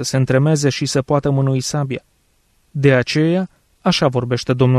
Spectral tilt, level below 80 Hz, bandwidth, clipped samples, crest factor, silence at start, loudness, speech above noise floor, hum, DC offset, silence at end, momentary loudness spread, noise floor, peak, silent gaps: -5.5 dB/octave; -48 dBFS; 13.5 kHz; under 0.1%; 14 dB; 0 s; -17 LUFS; 44 dB; none; under 0.1%; 0 s; 8 LU; -60 dBFS; -2 dBFS; none